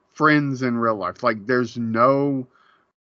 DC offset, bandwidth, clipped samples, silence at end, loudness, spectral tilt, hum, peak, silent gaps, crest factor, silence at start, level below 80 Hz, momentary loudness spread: under 0.1%; 7.2 kHz; under 0.1%; 0.55 s; -21 LUFS; -5.5 dB/octave; none; -4 dBFS; none; 18 dB; 0.15 s; -70 dBFS; 7 LU